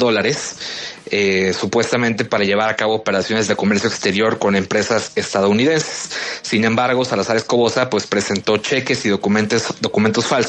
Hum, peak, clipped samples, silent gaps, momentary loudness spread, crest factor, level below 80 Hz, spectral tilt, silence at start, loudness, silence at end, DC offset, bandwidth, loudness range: none; 0 dBFS; under 0.1%; none; 4 LU; 16 dB; -58 dBFS; -4 dB/octave; 0 s; -17 LUFS; 0 s; under 0.1%; 9.2 kHz; 1 LU